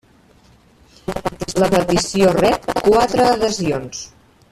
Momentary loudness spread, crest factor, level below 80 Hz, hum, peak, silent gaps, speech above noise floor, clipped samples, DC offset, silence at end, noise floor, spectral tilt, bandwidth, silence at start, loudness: 16 LU; 16 dB; -42 dBFS; none; -2 dBFS; none; 35 dB; under 0.1%; under 0.1%; 0.45 s; -51 dBFS; -4.5 dB/octave; 14.5 kHz; 1.1 s; -17 LUFS